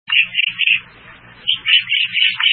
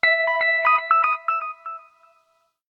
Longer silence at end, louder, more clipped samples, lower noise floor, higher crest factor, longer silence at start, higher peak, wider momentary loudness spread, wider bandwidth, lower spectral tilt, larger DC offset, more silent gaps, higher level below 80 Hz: second, 0 s vs 0.9 s; first, -14 LUFS vs -19 LUFS; neither; second, -41 dBFS vs -66 dBFS; about the same, 18 dB vs 18 dB; about the same, 0.1 s vs 0.05 s; first, 0 dBFS vs -4 dBFS; second, 6 LU vs 18 LU; second, 4.6 kHz vs 6 kHz; about the same, -2 dB/octave vs -1.5 dB/octave; neither; neither; first, -60 dBFS vs -72 dBFS